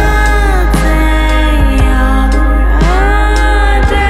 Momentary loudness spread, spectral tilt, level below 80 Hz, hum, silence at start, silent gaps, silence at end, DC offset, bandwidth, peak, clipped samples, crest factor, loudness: 1 LU; -6 dB/octave; -10 dBFS; none; 0 s; none; 0 s; under 0.1%; 13 kHz; 0 dBFS; under 0.1%; 8 dB; -11 LUFS